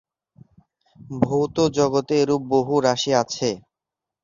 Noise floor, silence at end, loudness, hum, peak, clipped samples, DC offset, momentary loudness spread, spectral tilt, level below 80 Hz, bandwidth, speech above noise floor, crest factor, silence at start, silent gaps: -87 dBFS; 0.65 s; -21 LUFS; none; -2 dBFS; under 0.1%; under 0.1%; 7 LU; -5 dB/octave; -56 dBFS; 7.4 kHz; 66 dB; 20 dB; 1 s; none